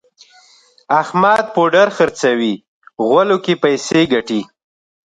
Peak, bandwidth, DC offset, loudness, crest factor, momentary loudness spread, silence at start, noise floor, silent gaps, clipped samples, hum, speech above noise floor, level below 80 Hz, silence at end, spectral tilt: 0 dBFS; 11 kHz; under 0.1%; -15 LUFS; 16 dB; 9 LU; 0.9 s; -50 dBFS; 2.68-2.82 s; under 0.1%; none; 36 dB; -58 dBFS; 0.7 s; -5 dB/octave